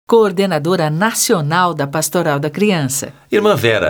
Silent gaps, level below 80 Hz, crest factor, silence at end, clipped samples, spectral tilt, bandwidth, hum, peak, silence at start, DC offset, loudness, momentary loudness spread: none; -58 dBFS; 12 dB; 0 s; under 0.1%; -4.5 dB/octave; over 20 kHz; none; -2 dBFS; 0.1 s; under 0.1%; -15 LUFS; 5 LU